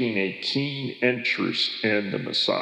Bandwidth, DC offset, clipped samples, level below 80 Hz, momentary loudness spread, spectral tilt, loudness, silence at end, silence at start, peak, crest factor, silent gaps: 11 kHz; under 0.1%; under 0.1%; -84 dBFS; 3 LU; -5 dB/octave; -25 LUFS; 0 s; 0 s; -8 dBFS; 18 dB; none